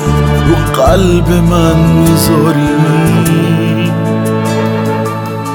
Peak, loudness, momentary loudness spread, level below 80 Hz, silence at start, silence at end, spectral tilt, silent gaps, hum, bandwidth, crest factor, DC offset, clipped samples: 0 dBFS; -10 LUFS; 5 LU; -22 dBFS; 0 s; 0 s; -6.5 dB/octave; none; none; 19 kHz; 10 dB; under 0.1%; under 0.1%